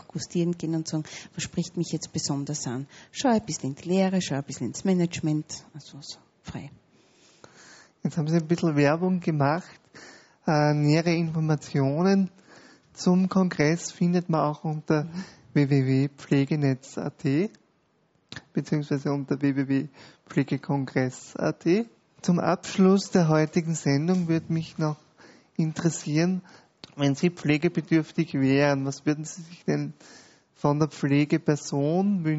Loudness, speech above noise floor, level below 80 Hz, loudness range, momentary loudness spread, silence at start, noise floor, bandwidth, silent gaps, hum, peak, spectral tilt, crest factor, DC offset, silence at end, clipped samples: -26 LUFS; 42 dB; -64 dBFS; 5 LU; 12 LU; 0.15 s; -67 dBFS; 8 kHz; none; none; -6 dBFS; -6.5 dB/octave; 20 dB; under 0.1%; 0 s; under 0.1%